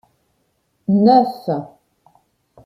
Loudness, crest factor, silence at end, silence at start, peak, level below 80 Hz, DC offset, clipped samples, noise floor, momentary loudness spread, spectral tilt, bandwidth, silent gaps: -16 LUFS; 18 dB; 1 s; 0.9 s; -2 dBFS; -64 dBFS; under 0.1%; under 0.1%; -66 dBFS; 14 LU; -9 dB/octave; 12 kHz; none